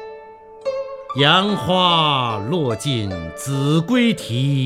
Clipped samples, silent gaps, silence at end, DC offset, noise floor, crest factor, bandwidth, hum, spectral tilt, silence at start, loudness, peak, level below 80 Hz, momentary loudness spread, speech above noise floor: under 0.1%; none; 0 s; under 0.1%; -40 dBFS; 18 dB; 15 kHz; none; -5.5 dB/octave; 0 s; -18 LUFS; 0 dBFS; -50 dBFS; 13 LU; 22 dB